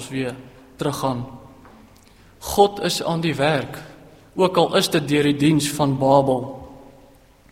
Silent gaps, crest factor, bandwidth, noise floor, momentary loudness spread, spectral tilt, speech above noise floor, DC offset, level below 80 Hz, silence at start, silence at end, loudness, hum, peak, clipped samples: none; 20 dB; 16 kHz; -50 dBFS; 17 LU; -5 dB/octave; 31 dB; under 0.1%; -50 dBFS; 0 s; 0.65 s; -20 LUFS; none; -2 dBFS; under 0.1%